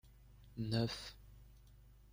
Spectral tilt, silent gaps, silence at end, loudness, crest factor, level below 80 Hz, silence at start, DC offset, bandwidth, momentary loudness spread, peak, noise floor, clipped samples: -6 dB/octave; none; 0 s; -41 LUFS; 22 dB; -62 dBFS; 0.05 s; under 0.1%; 16 kHz; 25 LU; -24 dBFS; -62 dBFS; under 0.1%